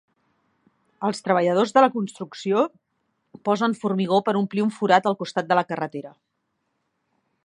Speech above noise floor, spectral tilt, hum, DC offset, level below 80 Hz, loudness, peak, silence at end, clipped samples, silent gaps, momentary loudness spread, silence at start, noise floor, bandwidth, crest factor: 54 dB; -6 dB/octave; none; under 0.1%; -74 dBFS; -22 LUFS; -2 dBFS; 1.35 s; under 0.1%; none; 11 LU; 1 s; -75 dBFS; 11 kHz; 22 dB